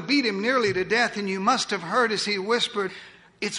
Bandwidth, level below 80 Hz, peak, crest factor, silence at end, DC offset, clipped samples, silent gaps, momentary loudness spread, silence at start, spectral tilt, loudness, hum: 11 kHz; -64 dBFS; -8 dBFS; 18 dB; 0 s; under 0.1%; under 0.1%; none; 8 LU; 0 s; -3.5 dB/octave; -24 LUFS; none